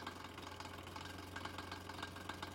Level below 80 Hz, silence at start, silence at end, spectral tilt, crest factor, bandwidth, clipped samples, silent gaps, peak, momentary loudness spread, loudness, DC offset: -70 dBFS; 0 s; 0 s; -4 dB/octave; 18 dB; 16.5 kHz; under 0.1%; none; -32 dBFS; 2 LU; -49 LUFS; under 0.1%